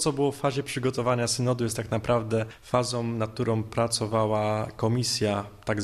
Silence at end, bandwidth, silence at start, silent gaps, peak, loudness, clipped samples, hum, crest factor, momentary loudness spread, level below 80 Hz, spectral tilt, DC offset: 0 s; 13.5 kHz; 0 s; none; -8 dBFS; -27 LUFS; under 0.1%; none; 18 dB; 4 LU; -54 dBFS; -5 dB/octave; under 0.1%